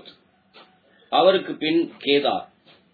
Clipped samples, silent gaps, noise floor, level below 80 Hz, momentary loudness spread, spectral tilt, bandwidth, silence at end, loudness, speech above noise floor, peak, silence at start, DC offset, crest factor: under 0.1%; none; -56 dBFS; -78 dBFS; 7 LU; -7.5 dB/octave; 4.8 kHz; 0.5 s; -21 LUFS; 36 dB; -4 dBFS; 1.1 s; under 0.1%; 20 dB